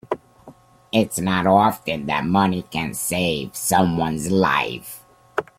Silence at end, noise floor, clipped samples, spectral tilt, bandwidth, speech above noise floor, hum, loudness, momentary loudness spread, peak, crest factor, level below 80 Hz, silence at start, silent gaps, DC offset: 0.15 s; -48 dBFS; under 0.1%; -4.5 dB/octave; 16.5 kHz; 28 dB; none; -21 LUFS; 13 LU; -2 dBFS; 20 dB; -52 dBFS; 0.1 s; none; under 0.1%